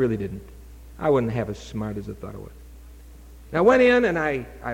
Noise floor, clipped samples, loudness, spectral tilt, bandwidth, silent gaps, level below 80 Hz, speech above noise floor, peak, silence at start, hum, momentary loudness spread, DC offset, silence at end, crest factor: -44 dBFS; under 0.1%; -22 LUFS; -7 dB/octave; 16.5 kHz; none; -44 dBFS; 22 dB; -6 dBFS; 0 s; none; 21 LU; under 0.1%; 0 s; 18 dB